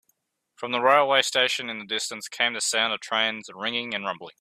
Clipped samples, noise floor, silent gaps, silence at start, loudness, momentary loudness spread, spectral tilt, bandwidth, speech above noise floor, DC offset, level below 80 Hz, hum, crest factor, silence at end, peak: under 0.1%; -72 dBFS; none; 0.6 s; -24 LUFS; 11 LU; -1 dB/octave; 15.5 kHz; 47 dB; under 0.1%; -76 dBFS; none; 22 dB; 0.1 s; -4 dBFS